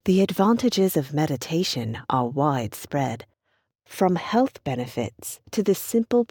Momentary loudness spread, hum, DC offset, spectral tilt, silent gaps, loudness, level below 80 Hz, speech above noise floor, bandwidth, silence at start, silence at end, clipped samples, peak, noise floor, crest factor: 10 LU; none; under 0.1%; -6 dB/octave; none; -24 LUFS; -60 dBFS; 50 dB; 19.5 kHz; 0.05 s; 0.05 s; under 0.1%; -8 dBFS; -73 dBFS; 16 dB